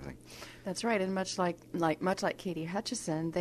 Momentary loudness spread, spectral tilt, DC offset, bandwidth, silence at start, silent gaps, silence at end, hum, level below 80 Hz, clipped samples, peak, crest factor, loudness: 12 LU; -4.5 dB/octave; under 0.1%; 13.5 kHz; 0 s; none; 0 s; none; -62 dBFS; under 0.1%; -16 dBFS; 18 dB; -34 LUFS